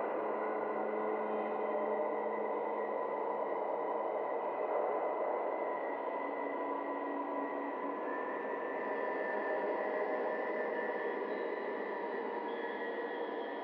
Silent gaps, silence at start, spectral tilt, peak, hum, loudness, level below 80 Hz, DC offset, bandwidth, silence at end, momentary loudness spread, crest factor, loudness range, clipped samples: none; 0 s; -7.5 dB/octave; -24 dBFS; none; -37 LUFS; under -90 dBFS; under 0.1%; 5.6 kHz; 0 s; 3 LU; 14 dB; 2 LU; under 0.1%